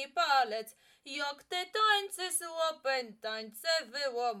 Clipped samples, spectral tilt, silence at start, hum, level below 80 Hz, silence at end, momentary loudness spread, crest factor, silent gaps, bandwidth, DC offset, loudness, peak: under 0.1%; 0 dB/octave; 0 s; none; -86 dBFS; 0 s; 11 LU; 18 dB; none; 17.5 kHz; under 0.1%; -32 LUFS; -14 dBFS